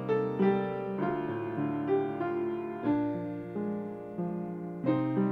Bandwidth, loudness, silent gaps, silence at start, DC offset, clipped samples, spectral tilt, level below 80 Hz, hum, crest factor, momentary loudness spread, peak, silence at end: 5.2 kHz; -32 LUFS; none; 0 s; under 0.1%; under 0.1%; -10 dB/octave; -66 dBFS; none; 16 dB; 9 LU; -14 dBFS; 0 s